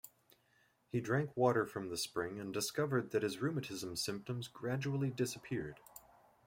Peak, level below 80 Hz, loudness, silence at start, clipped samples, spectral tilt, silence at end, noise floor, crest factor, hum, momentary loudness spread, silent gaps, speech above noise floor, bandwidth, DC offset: -18 dBFS; -72 dBFS; -38 LUFS; 0.05 s; under 0.1%; -5 dB/octave; 0.45 s; -74 dBFS; 20 dB; none; 11 LU; none; 36 dB; 16.5 kHz; under 0.1%